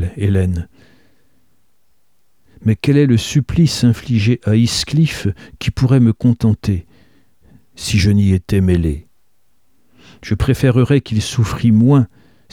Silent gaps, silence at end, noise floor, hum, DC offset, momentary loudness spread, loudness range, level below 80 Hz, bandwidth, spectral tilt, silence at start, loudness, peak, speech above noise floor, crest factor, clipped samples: none; 0.45 s; -66 dBFS; none; 0.3%; 11 LU; 4 LU; -34 dBFS; 15 kHz; -6.5 dB/octave; 0 s; -15 LUFS; -2 dBFS; 52 dB; 14 dB; under 0.1%